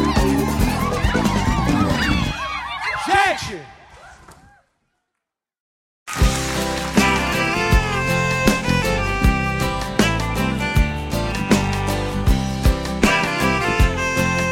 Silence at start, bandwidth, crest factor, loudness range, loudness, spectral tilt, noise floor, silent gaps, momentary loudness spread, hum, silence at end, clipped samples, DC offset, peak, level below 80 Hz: 0 s; 16.5 kHz; 18 dB; 6 LU; -19 LUFS; -5 dB/octave; -82 dBFS; 5.60-6.06 s; 6 LU; none; 0 s; under 0.1%; under 0.1%; -2 dBFS; -26 dBFS